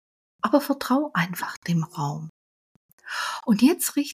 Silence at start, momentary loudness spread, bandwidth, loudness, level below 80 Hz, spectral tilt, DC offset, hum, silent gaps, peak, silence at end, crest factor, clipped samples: 0.45 s; 11 LU; 15.5 kHz; -24 LUFS; -70 dBFS; -5 dB/octave; under 0.1%; none; 1.57-1.62 s, 2.29-2.98 s; -4 dBFS; 0 s; 20 dB; under 0.1%